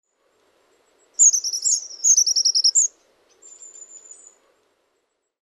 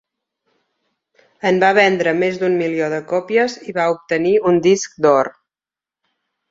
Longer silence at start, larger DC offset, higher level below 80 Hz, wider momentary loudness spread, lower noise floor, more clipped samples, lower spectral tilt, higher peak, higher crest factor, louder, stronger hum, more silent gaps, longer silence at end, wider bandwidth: second, 1.2 s vs 1.45 s; neither; second, -86 dBFS vs -62 dBFS; about the same, 8 LU vs 7 LU; second, -73 dBFS vs under -90 dBFS; neither; second, 6.5 dB/octave vs -5 dB/octave; about the same, -4 dBFS vs -2 dBFS; about the same, 18 dB vs 18 dB; about the same, -16 LUFS vs -16 LUFS; neither; neither; first, 1.45 s vs 1.2 s; first, 15.5 kHz vs 7.8 kHz